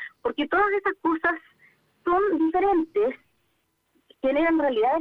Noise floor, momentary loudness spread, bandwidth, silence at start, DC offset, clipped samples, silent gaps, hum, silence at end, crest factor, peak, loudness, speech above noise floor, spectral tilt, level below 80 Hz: -72 dBFS; 8 LU; 4.7 kHz; 0 s; under 0.1%; under 0.1%; none; none; 0 s; 16 dB; -10 dBFS; -24 LUFS; 49 dB; -6.5 dB/octave; -56 dBFS